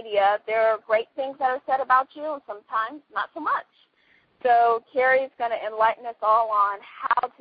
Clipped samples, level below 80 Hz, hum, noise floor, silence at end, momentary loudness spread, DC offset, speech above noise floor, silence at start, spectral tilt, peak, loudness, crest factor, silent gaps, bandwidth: under 0.1%; -70 dBFS; none; -62 dBFS; 0.1 s; 11 LU; under 0.1%; 39 dB; 0 s; -7 dB/octave; -6 dBFS; -24 LUFS; 18 dB; none; 5 kHz